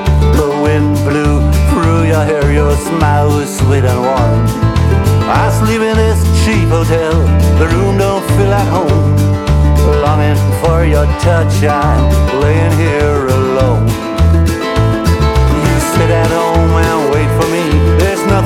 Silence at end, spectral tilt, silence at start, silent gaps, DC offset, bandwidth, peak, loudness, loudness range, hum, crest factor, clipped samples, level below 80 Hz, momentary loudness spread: 0 s; -6.5 dB/octave; 0 s; none; under 0.1%; 16 kHz; 0 dBFS; -11 LUFS; 1 LU; none; 10 dB; under 0.1%; -16 dBFS; 2 LU